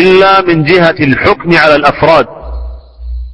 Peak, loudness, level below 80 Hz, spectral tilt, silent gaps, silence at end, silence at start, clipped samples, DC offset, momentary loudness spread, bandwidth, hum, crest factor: 0 dBFS; -7 LUFS; -26 dBFS; -7 dB/octave; none; 0 s; 0 s; 2%; under 0.1%; 19 LU; 11 kHz; none; 8 dB